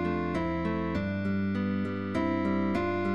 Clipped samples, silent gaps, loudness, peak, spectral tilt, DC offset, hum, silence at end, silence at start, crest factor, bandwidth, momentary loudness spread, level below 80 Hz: under 0.1%; none; -30 LUFS; -18 dBFS; -8.5 dB/octave; 0.4%; none; 0 s; 0 s; 12 dB; 8.2 kHz; 3 LU; -52 dBFS